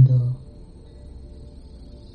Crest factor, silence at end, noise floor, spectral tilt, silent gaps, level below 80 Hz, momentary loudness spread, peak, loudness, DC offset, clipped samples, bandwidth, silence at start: 18 dB; 0.4 s; -42 dBFS; -11 dB/octave; none; -42 dBFS; 24 LU; -4 dBFS; -22 LUFS; under 0.1%; under 0.1%; 4.5 kHz; 0 s